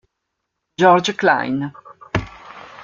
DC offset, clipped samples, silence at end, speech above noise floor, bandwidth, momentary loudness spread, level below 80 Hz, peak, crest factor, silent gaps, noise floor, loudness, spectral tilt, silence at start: under 0.1%; under 0.1%; 0 s; 61 dB; 7.6 kHz; 23 LU; -48 dBFS; -2 dBFS; 18 dB; none; -77 dBFS; -18 LUFS; -5 dB/octave; 0.8 s